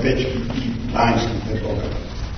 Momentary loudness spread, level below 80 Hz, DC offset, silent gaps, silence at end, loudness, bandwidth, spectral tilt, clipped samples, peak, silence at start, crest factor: 8 LU; -30 dBFS; under 0.1%; none; 0 s; -22 LUFS; 6.6 kHz; -6.5 dB/octave; under 0.1%; -4 dBFS; 0 s; 18 dB